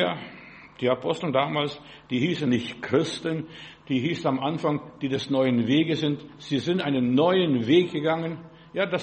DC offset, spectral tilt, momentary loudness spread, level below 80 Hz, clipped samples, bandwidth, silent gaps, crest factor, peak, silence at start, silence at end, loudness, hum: under 0.1%; -6.5 dB/octave; 13 LU; -64 dBFS; under 0.1%; 8.4 kHz; none; 16 dB; -8 dBFS; 0 s; 0 s; -25 LUFS; none